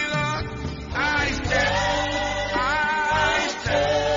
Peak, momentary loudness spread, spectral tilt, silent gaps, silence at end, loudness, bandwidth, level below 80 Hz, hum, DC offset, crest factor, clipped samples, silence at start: -10 dBFS; 7 LU; -4 dB/octave; none; 0 s; -23 LUFS; 7.6 kHz; -38 dBFS; none; under 0.1%; 14 dB; under 0.1%; 0 s